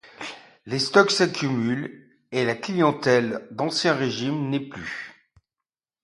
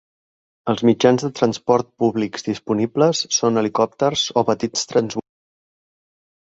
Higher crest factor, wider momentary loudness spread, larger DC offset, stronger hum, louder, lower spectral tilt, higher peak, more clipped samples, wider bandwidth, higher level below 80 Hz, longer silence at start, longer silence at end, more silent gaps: first, 24 dB vs 18 dB; first, 18 LU vs 8 LU; neither; neither; second, -23 LUFS vs -19 LUFS; about the same, -4.5 dB/octave vs -4.5 dB/octave; about the same, 0 dBFS vs -2 dBFS; neither; first, 11.5 kHz vs 8 kHz; second, -66 dBFS vs -60 dBFS; second, 0.2 s vs 0.65 s; second, 0.9 s vs 1.35 s; neither